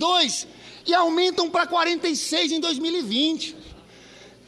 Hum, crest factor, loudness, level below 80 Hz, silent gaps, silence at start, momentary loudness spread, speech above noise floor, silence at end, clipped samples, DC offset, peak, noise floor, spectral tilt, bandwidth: none; 16 dB; -22 LUFS; -60 dBFS; none; 0 s; 10 LU; 25 dB; 0.2 s; under 0.1%; under 0.1%; -6 dBFS; -47 dBFS; -2 dB/octave; 13 kHz